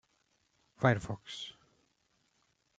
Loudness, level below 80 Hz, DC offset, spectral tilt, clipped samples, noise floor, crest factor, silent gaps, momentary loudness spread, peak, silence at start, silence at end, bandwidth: -34 LUFS; -66 dBFS; under 0.1%; -6 dB/octave; under 0.1%; -76 dBFS; 28 dB; none; 14 LU; -10 dBFS; 0.8 s; 1.25 s; 9 kHz